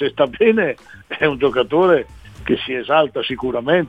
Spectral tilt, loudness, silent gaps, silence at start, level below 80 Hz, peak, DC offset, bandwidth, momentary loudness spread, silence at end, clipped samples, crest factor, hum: -7 dB/octave; -18 LUFS; none; 0 s; -46 dBFS; -2 dBFS; 0.1%; 8 kHz; 13 LU; 0 s; under 0.1%; 16 dB; none